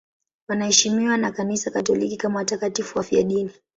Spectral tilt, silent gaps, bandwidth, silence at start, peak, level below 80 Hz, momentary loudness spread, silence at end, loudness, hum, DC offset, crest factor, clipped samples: -3 dB/octave; none; 8.2 kHz; 0.5 s; -2 dBFS; -60 dBFS; 9 LU; 0.25 s; -22 LUFS; none; under 0.1%; 20 dB; under 0.1%